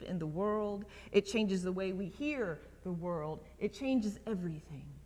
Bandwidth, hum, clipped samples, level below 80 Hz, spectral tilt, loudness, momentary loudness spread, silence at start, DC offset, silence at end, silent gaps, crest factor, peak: 13 kHz; none; under 0.1%; -58 dBFS; -6.5 dB/octave; -37 LUFS; 10 LU; 0 s; under 0.1%; 0 s; none; 22 dB; -16 dBFS